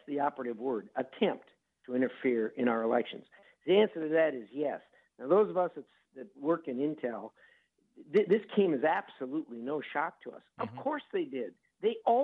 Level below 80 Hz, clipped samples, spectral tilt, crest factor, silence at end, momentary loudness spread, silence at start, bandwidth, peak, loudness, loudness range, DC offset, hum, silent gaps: -86 dBFS; under 0.1%; -8.5 dB/octave; 18 dB; 0 s; 16 LU; 0.1 s; 4.8 kHz; -14 dBFS; -32 LUFS; 3 LU; under 0.1%; none; none